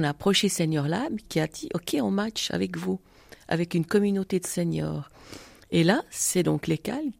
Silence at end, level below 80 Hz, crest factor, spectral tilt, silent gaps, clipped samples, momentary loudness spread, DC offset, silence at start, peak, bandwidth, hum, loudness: 0.05 s; -58 dBFS; 20 dB; -4.5 dB/octave; none; under 0.1%; 10 LU; under 0.1%; 0 s; -8 dBFS; 16 kHz; none; -26 LUFS